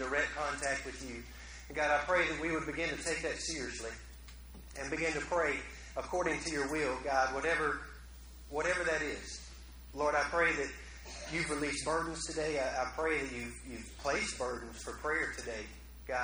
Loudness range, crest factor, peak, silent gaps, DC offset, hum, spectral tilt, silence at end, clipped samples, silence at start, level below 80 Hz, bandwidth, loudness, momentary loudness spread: 3 LU; 20 dB; -16 dBFS; none; under 0.1%; none; -3 dB/octave; 0 s; under 0.1%; 0 s; -52 dBFS; over 20 kHz; -35 LUFS; 17 LU